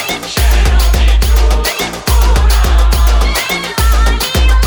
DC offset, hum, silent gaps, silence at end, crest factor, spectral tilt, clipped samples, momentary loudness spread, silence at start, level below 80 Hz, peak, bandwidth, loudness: under 0.1%; none; none; 0 s; 10 dB; -4 dB/octave; under 0.1%; 3 LU; 0 s; -10 dBFS; 0 dBFS; over 20 kHz; -12 LUFS